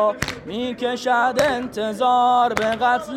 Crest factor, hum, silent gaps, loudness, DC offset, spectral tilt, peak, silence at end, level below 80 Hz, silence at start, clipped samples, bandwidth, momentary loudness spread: 16 dB; none; none; -20 LUFS; under 0.1%; -4 dB/octave; -4 dBFS; 0 s; -48 dBFS; 0 s; under 0.1%; 16 kHz; 10 LU